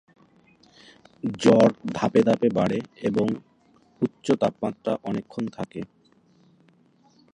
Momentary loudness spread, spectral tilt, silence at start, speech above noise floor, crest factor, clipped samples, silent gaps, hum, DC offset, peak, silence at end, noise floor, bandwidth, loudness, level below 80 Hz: 15 LU; -7 dB/octave; 1.25 s; 37 dB; 22 dB; under 0.1%; none; none; under 0.1%; -2 dBFS; 1.5 s; -60 dBFS; 10 kHz; -24 LUFS; -62 dBFS